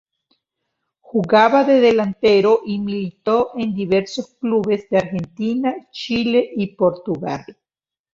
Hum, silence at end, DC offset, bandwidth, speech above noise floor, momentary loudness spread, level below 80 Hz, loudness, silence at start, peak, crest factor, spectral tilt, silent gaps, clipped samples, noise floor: none; 0.6 s; under 0.1%; 7.6 kHz; over 72 dB; 12 LU; -56 dBFS; -18 LUFS; 1.15 s; -2 dBFS; 18 dB; -6.5 dB/octave; none; under 0.1%; under -90 dBFS